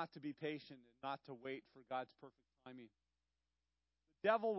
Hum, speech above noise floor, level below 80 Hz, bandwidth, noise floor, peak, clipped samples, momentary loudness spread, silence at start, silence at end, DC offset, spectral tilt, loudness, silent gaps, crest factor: 60 Hz at -90 dBFS; over 45 dB; under -90 dBFS; 5.6 kHz; under -90 dBFS; -22 dBFS; under 0.1%; 23 LU; 0 s; 0 s; under 0.1%; -3.5 dB/octave; -46 LUFS; none; 26 dB